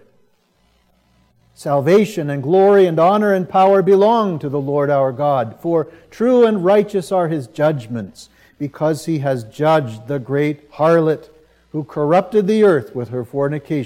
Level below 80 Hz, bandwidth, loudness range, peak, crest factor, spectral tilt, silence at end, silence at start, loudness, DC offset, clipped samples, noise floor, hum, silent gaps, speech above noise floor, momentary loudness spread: -60 dBFS; 15 kHz; 6 LU; -2 dBFS; 14 dB; -7.5 dB/octave; 0 s; 1.6 s; -16 LUFS; under 0.1%; under 0.1%; -59 dBFS; none; none; 44 dB; 13 LU